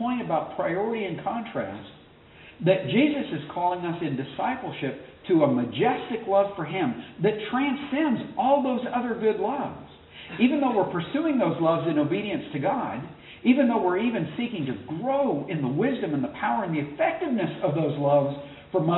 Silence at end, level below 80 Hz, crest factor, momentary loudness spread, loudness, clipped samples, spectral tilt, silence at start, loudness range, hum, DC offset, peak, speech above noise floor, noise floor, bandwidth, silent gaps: 0 s; -62 dBFS; 18 dB; 9 LU; -26 LUFS; under 0.1%; -5.5 dB/octave; 0 s; 2 LU; none; under 0.1%; -8 dBFS; 25 dB; -50 dBFS; 4.1 kHz; none